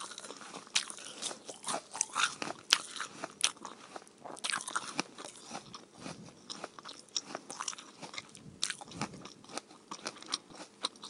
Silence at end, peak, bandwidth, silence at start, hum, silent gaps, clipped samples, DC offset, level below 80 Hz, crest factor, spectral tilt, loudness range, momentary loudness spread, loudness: 0 s; 0 dBFS; 15.5 kHz; 0 s; none; none; under 0.1%; under 0.1%; -80 dBFS; 40 dB; -0.5 dB/octave; 8 LU; 17 LU; -37 LUFS